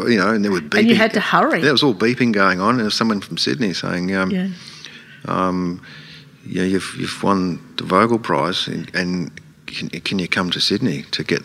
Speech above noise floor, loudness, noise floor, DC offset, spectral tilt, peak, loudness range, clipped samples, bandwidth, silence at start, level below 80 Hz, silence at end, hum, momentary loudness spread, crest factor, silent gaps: 21 dB; -18 LUFS; -39 dBFS; under 0.1%; -5 dB/octave; 0 dBFS; 7 LU; under 0.1%; 14.5 kHz; 0 s; -58 dBFS; 0 s; none; 14 LU; 18 dB; none